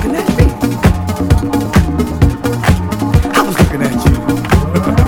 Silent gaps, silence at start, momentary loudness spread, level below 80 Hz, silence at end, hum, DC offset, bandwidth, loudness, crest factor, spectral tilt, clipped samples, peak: none; 0 s; 3 LU; -18 dBFS; 0 s; none; 0.2%; 18 kHz; -13 LUFS; 12 dB; -6.5 dB/octave; 0.2%; 0 dBFS